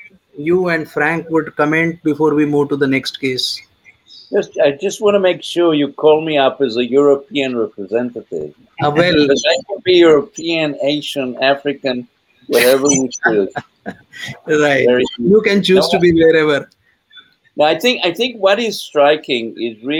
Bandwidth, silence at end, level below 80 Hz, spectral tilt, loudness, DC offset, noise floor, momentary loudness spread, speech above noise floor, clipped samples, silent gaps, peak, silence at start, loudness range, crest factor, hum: 17 kHz; 0 s; -54 dBFS; -4 dB/octave; -14 LUFS; under 0.1%; -46 dBFS; 11 LU; 31 dB; under 0.1%; none; 0 dBFS; 0.35 s; 3 LU; 14 dB; none